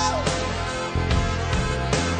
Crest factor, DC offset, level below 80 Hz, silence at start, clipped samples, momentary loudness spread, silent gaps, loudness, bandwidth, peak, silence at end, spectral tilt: 14 dB; under 0.1%; -30 dBFS; 0 s; under 0.1%; 3 LU; none; -24 LUFS; 10 kHz; -8 dBFS; 0 s; -4.5 dB/octave